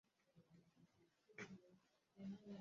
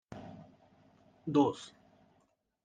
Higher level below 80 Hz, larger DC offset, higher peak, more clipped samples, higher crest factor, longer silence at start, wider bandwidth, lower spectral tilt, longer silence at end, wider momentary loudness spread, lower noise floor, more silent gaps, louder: second, under -90 dBFS vs -74 dBFS; neither; second, -42 dBFS vs -16 dBFS; neither; about the same, 20 dB vs 22 dB; first, 0.25 s vs 0.1 s; second, 7.2 kHz vs 9.2 kHz; about the same, -6 dB/octave vs -7 dB/octave; second, 0 s vs 1 s; second, 9 LU vs 23 LU; about the same, -77 dBFS vs -74 dBFS; neither; second, -58 LUFS vs -32 LUFS